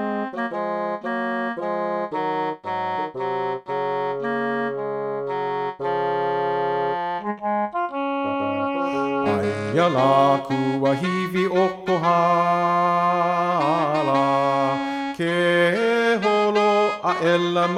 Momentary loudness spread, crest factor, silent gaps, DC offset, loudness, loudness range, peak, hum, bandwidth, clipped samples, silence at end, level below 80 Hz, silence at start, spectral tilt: 8 LU; 16 dB; none; under 0.1%; -22 LUFS; 6 LU; -6 dBFS; none; 13.5 kHz; under 0.1%; 0 s; -66 dBFS; 0 s; -6 dB/octave